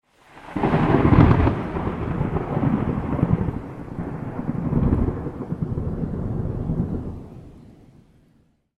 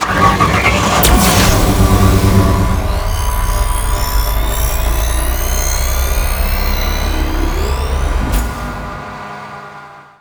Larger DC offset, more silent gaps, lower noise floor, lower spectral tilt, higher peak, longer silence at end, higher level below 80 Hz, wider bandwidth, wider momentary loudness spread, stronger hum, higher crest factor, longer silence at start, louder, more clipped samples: neither; neither; first, -60 dBFS vs -35 dBFS; first, -10 dB/octave vs -4.5 dB/octave; about the same, 0 dBFS vs 0 dBFS; first, 1.15 s vs 0.2 s; second, -32 dBFS vs -16 dBFS; second, 6 kHz vs over 20 kHz; about the same, 16 LU vs 15 LU; neither; first, 22 dB vs 14 dB; first, 0.35 s vs 0 s; second, -23 LUFS vs -14 LUFS; neither